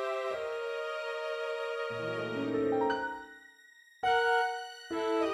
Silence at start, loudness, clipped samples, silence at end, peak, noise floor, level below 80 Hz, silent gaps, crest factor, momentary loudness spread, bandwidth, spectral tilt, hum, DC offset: 0 s; -33 LUFS; under 0.1%; 0 s; -18 dBFS; -59 dBFS; -70 dBFS; none; 16 dB; 10 LU; 13 kHz; -4.5 dB/octave; none; under 0.1%